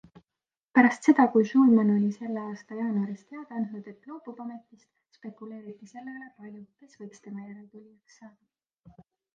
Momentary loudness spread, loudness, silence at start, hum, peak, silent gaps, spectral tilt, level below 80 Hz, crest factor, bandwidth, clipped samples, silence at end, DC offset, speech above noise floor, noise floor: 26 LU; -24 LUFS; 0.75 s; none; -6 dBFS; none; -7.5 dB/octave; -76 dBFS; 22 dB; 9.2 kHz; under 0.1%; 1.1 s; under 0.1%; over 63 dB; under -90 dBFS